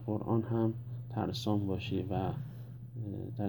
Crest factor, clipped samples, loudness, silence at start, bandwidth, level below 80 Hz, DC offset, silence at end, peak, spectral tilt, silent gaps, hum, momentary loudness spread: 18 dB; under 0.1%; -36 LUFS; 0 s; over 20 kHz; -60 dBFS; under 0.1%; 0 s; -18 dBFS; -8 dB/octave; none; none; 10 LU